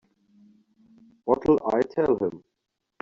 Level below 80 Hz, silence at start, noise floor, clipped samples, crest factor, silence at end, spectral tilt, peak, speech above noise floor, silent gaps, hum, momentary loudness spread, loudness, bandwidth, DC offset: -58 dBFS; 1.25 s; -58 dBFS; under 0.1%; 20 dB; 0.65 s; -7 dB/octave; -6 dBFS; 35 dB; none; none; 8 LU; -24 LUFS; 7.2 kHz; under 0.1%